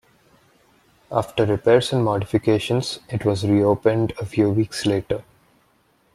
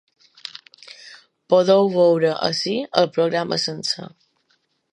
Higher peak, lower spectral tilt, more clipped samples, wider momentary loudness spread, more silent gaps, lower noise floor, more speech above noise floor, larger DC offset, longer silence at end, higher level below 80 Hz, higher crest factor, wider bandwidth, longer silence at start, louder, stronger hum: about the same, -2 dBFS vs 0 dBFS; first, -6.5 dB/octave vs -5 dB/octave; neither; second, 8 LU vs 24 LU; neither; second, -61 dBFS vs -67 dBFS; second, 42 dB vs 48 dB; neither; about the same, 0.95 s vs 0.85 s; first, -52 dBFS vs -70 dBFS; about the same, 18 dB vs 20 dB; first, 13 kHz vs 11 kHz; about the same, 1.1 s vs 1.05 s; about the same, -21 LUFS vs -19 LUFS; neither